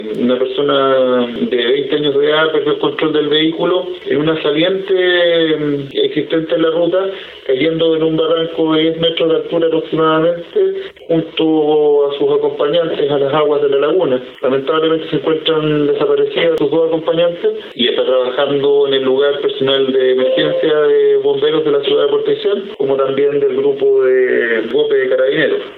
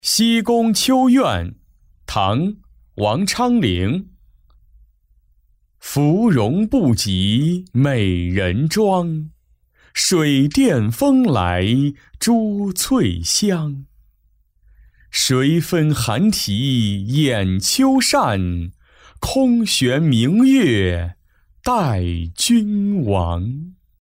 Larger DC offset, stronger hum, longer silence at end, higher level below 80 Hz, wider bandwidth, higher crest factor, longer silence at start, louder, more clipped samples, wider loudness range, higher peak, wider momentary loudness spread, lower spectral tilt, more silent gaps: neither; neither; second, 0 s vs 0.3 s; second, -54 dBFS vs -40 dBFS; second, 4.4 kHz vs 16 kHz; about the same, 12 dB vs 12 dB; about the same, 0 s vs 0.05 s; first, -14 LUFS vs -17 LUFS; neither; about the same, 2 LU vs 4 LU; first, 0 dBFS vs -6 dBFS; second, 5 LU vs 10 LU; first, -8 dB/octave vs -5 dB/octave; neither